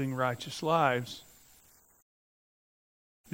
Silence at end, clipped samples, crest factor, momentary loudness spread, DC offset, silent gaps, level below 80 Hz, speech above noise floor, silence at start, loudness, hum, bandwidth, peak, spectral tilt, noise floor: 2.1 s; under 0.1%; 24 dB; 15 LU; under 0.1%; none; -72 dBFS; 32 dB; 0 s; -30 LUFS; none; 16 kHz; -12 dBFS; -5 dB/octave; -62 dBFS